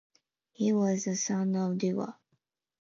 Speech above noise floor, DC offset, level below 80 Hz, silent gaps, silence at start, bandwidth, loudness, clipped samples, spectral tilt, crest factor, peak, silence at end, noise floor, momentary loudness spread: 49 dB; under 0.1%; -80 dBFS; none; 0.6 s; 7.6 kHz; -30 LUFS; under 0.1%; -5.5 dB/octave; 14 dB; -18 dBFS; 0.7 s; -78 dBFS; 6 LU